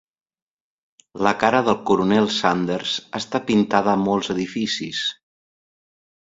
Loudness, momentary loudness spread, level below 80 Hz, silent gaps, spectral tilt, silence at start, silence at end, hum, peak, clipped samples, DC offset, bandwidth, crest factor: -21 LUFS; 7 LU; -58 dBFS; none; -5 dB/octave; 1.15 s; 1.25 s; none; 0 dBFS; under 0.1%; under 0.1%; 7.8 kHz; 22 dB